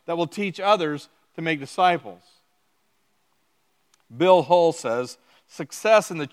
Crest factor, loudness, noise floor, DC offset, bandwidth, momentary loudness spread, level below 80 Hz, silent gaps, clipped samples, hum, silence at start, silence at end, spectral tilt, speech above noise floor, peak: 20 dB; -22 LUFS; -70 dBFS; under 0.1%; 15 kHz; 17 LU; -80 dBFS; none; under 0.1%; none; 0.1 s; 0.05 s; -4.5 dB/octave; 48 dB; -4 dBFS